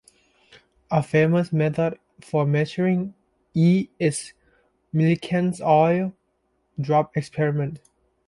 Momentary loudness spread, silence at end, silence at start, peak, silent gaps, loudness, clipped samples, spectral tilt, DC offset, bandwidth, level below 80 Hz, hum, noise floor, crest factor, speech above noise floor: 13 LU; 0.5 s; 0.9 s; -6 dBFS; none; -22 LUFS; under 0.1%; -7 dB/octave; under 0.1%; 11.5 kHz; -60 dBFS; none; -70 dBFS; 18 dB; 49 dB